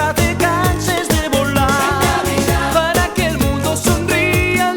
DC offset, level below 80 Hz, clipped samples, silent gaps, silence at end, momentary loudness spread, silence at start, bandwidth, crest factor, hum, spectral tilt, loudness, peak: under 0.1%; -28 dBFS; under 0.1%; none; 0 s; 2 LU; 0 s; over 20 kHz; 12 dB; none; -4.5 dB/octave; -15 LUFS; -2 dBFS